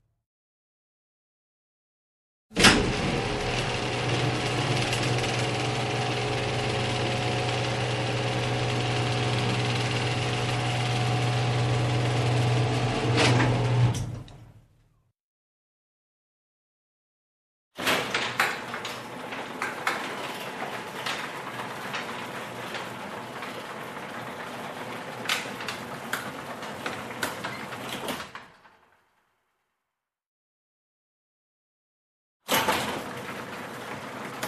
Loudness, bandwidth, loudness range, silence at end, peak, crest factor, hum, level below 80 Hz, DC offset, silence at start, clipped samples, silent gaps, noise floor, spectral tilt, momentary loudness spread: -28 LUFS; 14 kHz; 11 LU; 0 s; -4 dBFS; 26 dB; none; -50 dBFS; under 0.1%; 2.5 s; under 0.1%; 15.20-17.71 s, 30.26-32.40 s; -86 dBFS; -4.5 dB/octave; 12 LU